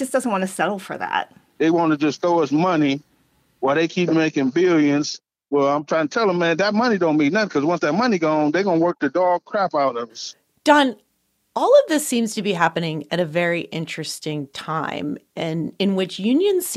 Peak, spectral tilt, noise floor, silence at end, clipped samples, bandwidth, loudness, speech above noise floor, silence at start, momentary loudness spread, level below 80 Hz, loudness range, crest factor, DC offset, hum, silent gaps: -2 dBFS; -5 dB/octave; -69 dBFS; 0 s; under 0.1%; 14.5 kHz; -20 LUFS; 49 dB; 0 s; 11 LU; -68 dBFS; 4 LU; 18 dB; under 0.1%; none; none